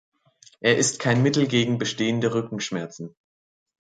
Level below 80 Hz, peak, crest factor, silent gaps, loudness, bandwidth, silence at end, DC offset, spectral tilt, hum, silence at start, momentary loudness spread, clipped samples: -64 dBFS; -4 dBFS; 20 dB; none; -23 LUFS; 9.4 kHz; 0.85 s; under 0.1%; -4.5 dB/octave; none; 0.6 s; 13 LU; under 0.1%